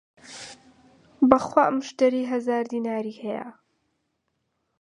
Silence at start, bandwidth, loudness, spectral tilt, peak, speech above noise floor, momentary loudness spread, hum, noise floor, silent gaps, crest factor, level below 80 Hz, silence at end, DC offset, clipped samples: 0.25 s; 10.5 kHz; -24 LUFS; -5.5 dB/octave; 0 dBFS; 53 dB; 21 LU; none; -76 dBFS; none; 26 dB; -64 dBFS; 1.3 s; under 0.1%; under 0.1%